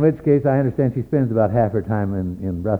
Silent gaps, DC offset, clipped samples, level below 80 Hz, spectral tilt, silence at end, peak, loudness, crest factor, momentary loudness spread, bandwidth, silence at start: none; under 0.1%; under 0.1%; -44 dBFS; -11.5 dB/octave; 0 s; -4 dBFS; -20 LUFS; 16 dB; 8 LU; 4.3 kHz; 0 s